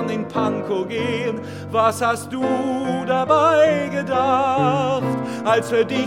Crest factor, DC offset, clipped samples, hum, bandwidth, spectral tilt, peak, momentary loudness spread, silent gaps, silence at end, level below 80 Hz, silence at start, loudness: 16 dB; 0.1%; under 0.1%; none; 16.5 kHz; -5.5 dB/octave; -2 dBFS; 8 LU; none; 0 s; -62 dBFS; 0 s; -20 LUFS